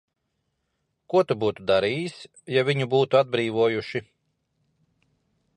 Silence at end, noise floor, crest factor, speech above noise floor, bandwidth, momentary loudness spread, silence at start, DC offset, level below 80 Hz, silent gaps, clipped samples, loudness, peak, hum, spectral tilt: 1.55 s; -77 dBFS; 20 dB; 54 dB; 10.5 kHz; 12 LU; 1.1 s; under 0.1%; -64 dBFS; none; under 0.1%; -24 LUFS; -6 dBFS; none; -6.5 dB/octave